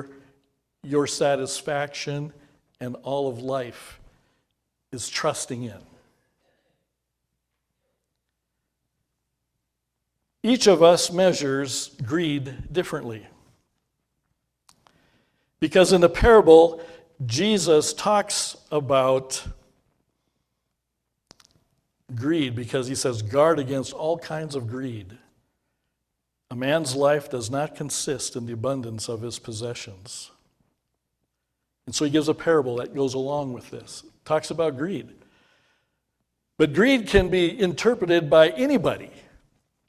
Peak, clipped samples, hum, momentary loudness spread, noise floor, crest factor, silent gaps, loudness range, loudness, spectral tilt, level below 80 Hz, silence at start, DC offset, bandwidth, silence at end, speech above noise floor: -2 dBFS; under 0.1%; none; 18 LU; -80 dBFS; 22 dB; none; 14 LU; -22 LUFS; -4.5 dB/octave; -46 dBFS; 0 s; under 0.1%; 15 kHz; 0.85 s; 58 dB